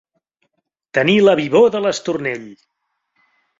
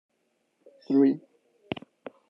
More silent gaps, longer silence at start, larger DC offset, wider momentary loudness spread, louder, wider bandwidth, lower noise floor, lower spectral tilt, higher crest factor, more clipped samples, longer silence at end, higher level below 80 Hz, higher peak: neither; about the same, 0.95 s vs 0.9 s; neither; second, 11 LU vs 16 LU; first, -15 LUFS vs -27 LUFS; first, 7.8 kHz vs 5.6 kHz; about the same, -71 dBFS vs -74 dBFS; second, -5 dB/octave vs -9 dB/octave; about the same, 16 dB vs 18 dB; neither; about the same, 1.05 s vs 1.1 s; first, -60 dBFS vs -76 dBFS; first, -2 dBFS vs -12 dBFS